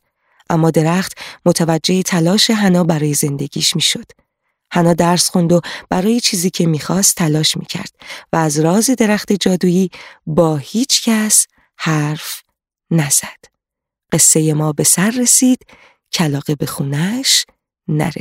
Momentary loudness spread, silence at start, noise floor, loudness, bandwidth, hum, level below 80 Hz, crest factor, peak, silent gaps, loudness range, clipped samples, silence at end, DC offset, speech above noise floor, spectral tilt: 11 LU; 0.5 s; -83 dBFS; -14 LUFS; 16.5 kHz; none; -52 dBFS; 16 dB; 0 dBFS; none; 2 LU; under 0.1%; 0 s; under 0.1%; 68 dB; -4 dB/octave